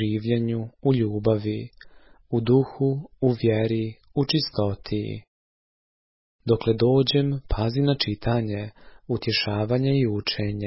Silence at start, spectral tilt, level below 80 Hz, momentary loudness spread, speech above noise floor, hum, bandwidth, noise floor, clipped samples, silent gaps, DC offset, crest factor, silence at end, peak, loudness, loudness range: 0 s; -10 dB/octave; -44 dBFS; 10 LU; over 67 dB; none; 5.8 kHz; under -90 dBFS; under 0.1%; 5.28-6.39 s; under 0.1%; 16 dB; 0 s; -8 dBFS; -24 LUFS; 3 LU